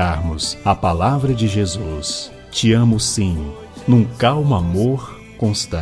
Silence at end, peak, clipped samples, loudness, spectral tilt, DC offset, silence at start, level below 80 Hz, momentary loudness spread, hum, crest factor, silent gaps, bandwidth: 0 s; 0 dBFS; under 0.1%; -18 LUFS; -5.5 dB/octave; under 0.1%; 0 s; -34 dBFS; 11 LU; none; 16 dB; none; 11 kHz